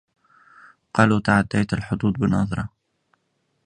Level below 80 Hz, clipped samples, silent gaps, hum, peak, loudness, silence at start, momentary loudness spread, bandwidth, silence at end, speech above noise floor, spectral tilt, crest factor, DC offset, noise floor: -46 dBFS; under 0.1%; none; none; 0 dBFS; -21 LUFS; 0.95 s; 8 LU; 10 kHz; 1 s; 51 dB; -7 dB/octave; 24 dB; under 0.1%; -71 dBFS